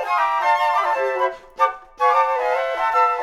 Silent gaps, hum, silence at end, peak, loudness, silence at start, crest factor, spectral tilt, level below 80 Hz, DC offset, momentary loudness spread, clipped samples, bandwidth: none; none; 0 s; -4 dBFS; -19 LUFS; 0 s; 16 dB; -1.5 dB/octave; -56 dBFS; under 0.1%; 4 LU; under 0.1%; 13.5 kHz